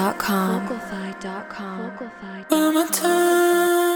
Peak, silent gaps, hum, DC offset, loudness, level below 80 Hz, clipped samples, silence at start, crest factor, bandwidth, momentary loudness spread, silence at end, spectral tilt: -4 dBFS; none; none; under 0.1%; -21 LUFS; -60 dBFS; under 0.1%; 0 s; 18 dB; over 20 kHz; 15 LU; 0 s; -4 dB/octave